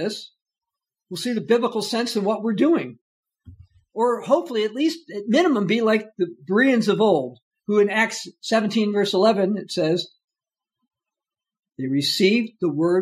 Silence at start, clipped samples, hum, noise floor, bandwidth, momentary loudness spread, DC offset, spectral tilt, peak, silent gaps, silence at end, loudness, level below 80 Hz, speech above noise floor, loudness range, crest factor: 0 s; under 0.1%; none; -89 dBFS; 15 kHz; 11 LU; under 0.1%; -5 dB/octave; -6 dBFS; 3.01-3.23 s, 7.42-7.51 s, 10.24-10.28 s; 0 s; -21 LUFS; -70 dBFS; 69 dB; 4 LU; 16 dB